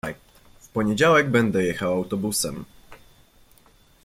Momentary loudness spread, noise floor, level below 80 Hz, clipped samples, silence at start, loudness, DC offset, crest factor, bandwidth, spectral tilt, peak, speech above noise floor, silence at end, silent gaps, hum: 16 LU; -56 dBFS; -54 dBFS; under 0.1%; 0.05 s; -22 LUFS; under 0.1%; 18 dB; 16 kHz; -4.5 dB/octave; -6 dBFS; 34 dB; 1.1 s; none; none